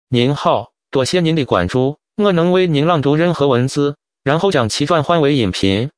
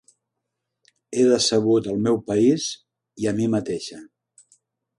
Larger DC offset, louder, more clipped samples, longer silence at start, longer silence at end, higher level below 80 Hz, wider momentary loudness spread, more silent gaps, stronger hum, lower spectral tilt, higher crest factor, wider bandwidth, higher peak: neither; first, -15 LUFS vs -21 LUFS; neither; second, 0.1 s vs 1.1 s; second, 0.1 s vs 0.95 s; first, -46 dBFS vs -60 dBFS; second, 6 LU vs 12 LU; neither; neither; about the same, -6 dB/octave vs -5 dB/octave; about the same, 14 dB vs 18 dB; about the same, 10.5 kHz vs 11.5 kHz; first, 0 dBFS vs -6 dBFS